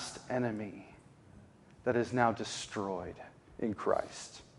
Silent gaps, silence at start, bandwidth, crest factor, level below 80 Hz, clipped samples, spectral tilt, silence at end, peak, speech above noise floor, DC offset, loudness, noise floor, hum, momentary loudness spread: none; 0 s; 11.5 kHz; 24 dB; -66 dBFS; under 0.1%; -5 dB/octave; 0.15 s; -12 dBFS; 23 dB; under 0.1%; -35 LUFS; -58 dBFS; none; 18 LU